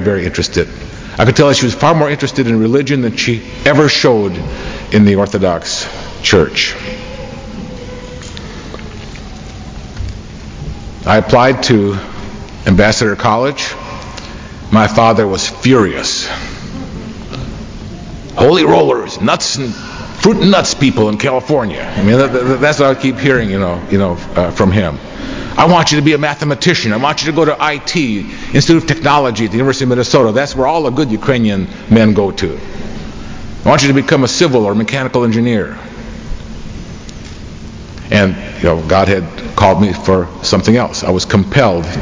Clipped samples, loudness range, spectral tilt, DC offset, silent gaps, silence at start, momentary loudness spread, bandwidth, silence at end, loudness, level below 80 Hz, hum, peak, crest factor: under 0.1%; 6 LU; -5 dB/octave; under 0.1%; none; 0 s; 19 LU; 7.6 kHz; 0 s; -12 LUFS; -32 dBFS; none; 0 dBFS; 12 dB